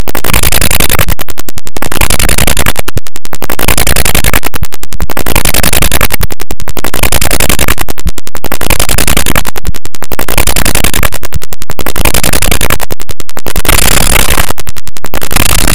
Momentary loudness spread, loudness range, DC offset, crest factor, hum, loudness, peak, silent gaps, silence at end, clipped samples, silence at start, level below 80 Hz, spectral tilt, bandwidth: 13 LU; 2 LU; 80%; 16 dB; none; -10 LUFS; 0 dBFS; none; 0 s; 10%; 0 s; -16 dBFS; -2.5 dB/octave; over 20 kHz